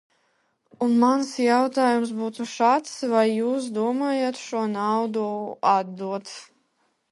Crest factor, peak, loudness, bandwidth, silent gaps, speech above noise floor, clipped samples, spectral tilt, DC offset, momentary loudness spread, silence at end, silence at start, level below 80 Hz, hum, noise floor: 18 dB; -6 dBFS; -23 LUFS; 11.5 kHz; none; 47 dB; under 0.1%; -5 dB/octave; under 0.1%; 10 LU; 0.65 s; 0.8 s; -78 dBFS; none; -70 dBFS